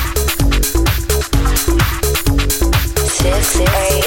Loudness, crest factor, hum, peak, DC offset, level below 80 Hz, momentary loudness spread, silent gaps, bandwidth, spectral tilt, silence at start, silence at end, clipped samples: -15 LUFS; 12 dB; none; -2 dBFS; under 0.1%; -16 dBFS; 3 LU; none; 17 kHz; -4 dB/octave; 0 s; 0 s; under 0.1%